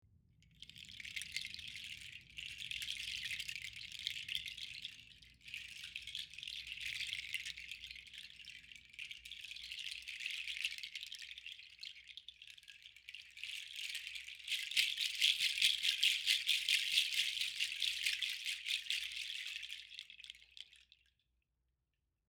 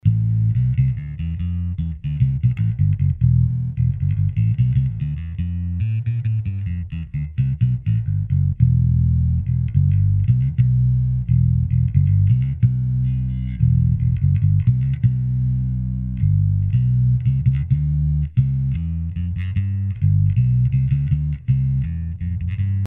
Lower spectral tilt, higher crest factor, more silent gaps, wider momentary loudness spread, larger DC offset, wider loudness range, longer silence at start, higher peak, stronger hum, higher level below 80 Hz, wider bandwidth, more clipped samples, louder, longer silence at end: second, 3 dB/octave vs -11.5 dB/octave; first, 28 dB vs 16 dB; neither; first, 21 LU vs 8 LU; neither; first, 13 LU vs 3 LU; first, 0.6 s vs 0.05 s; second, -16 dBFS vs -2 dBFS; neither; second, -74 dBFS vs -30 dBFS; first, over 20 kHz vs 3.1 kHz; neither; second, -38 LUFS vs -20 LUFS; first, 1.5 s vs 0 s